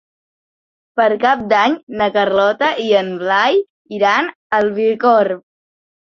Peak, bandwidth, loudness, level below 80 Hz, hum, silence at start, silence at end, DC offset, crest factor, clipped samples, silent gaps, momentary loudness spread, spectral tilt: -2 dBFS; 7 kHz; -15 LUFS; -60 dBFS; none; 0.95 s; 0.7 s; under 0.1%; 16 dB; under 0.1%; 1.83-1.87 s, 3.70-3.85 s, 4.35-4.50 s; 5 LU; -5 dB/octave